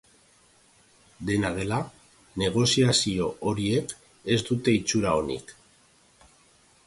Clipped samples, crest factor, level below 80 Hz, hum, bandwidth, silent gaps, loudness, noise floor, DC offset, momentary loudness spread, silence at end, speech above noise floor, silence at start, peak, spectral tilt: under 0.1%; 20 dB; -52 dBFS; none; 11.5 kHz; none; -25 LUFS; -60 dBFS; under 0.1%; 16 LU; 1.35 s; 35 dB; 1.2 s; -8 dBFS; -4.5 dB/octave